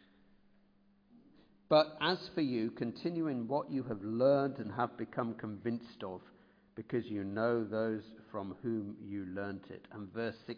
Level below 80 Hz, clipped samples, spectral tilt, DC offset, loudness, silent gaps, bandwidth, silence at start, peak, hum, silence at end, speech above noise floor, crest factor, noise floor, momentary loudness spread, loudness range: -76 dBFS; under 0.1%; -4.5 dB/octave; under 0.1%; -36 LUFS; none; 5.2 kHz; 1.7 s; -14 dBFS; none; 0 s; 33 dB; 22 dB; -68 dBFS; 16 LU; 5 LU